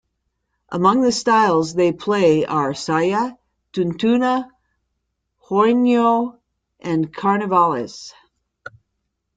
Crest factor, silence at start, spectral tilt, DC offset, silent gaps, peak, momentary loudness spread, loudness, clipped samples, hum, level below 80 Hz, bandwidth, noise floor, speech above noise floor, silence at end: 18 dB; 0.7 s; -5.5 dB/octave; under 0.1%; none; -2 dBFS; 14 LU; -18 LUFS; under 0.1%; none; -60 dBFS; 9.4 kHz; -75 dBFS; 58 dB; 1.25 s